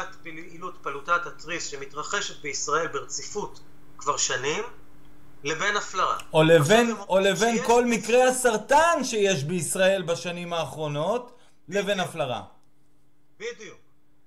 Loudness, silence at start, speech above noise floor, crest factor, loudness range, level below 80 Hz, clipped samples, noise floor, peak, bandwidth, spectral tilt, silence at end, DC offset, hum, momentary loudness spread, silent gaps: -24 LUFS; 0 s; 41 dB; 20 dB; 9 LU; -56 dBFS; under 0.1%; -66 dBFS; -6 dBFS; 15.5 kHz; -3.5 dB/octave; 0 s; 0.6%; none; 17 LU; none